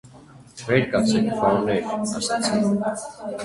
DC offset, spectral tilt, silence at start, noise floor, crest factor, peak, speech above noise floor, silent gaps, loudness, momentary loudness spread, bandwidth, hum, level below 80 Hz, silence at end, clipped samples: under 0.1%; -5 dB/octave; 0.05 s; -47 dBFS; 18 dB; -4 dBFS; 25 dB; none; -22 LUFS; 9 LU; 11.5 kHz; none; -54 dBFS; 0 s; under 0.1%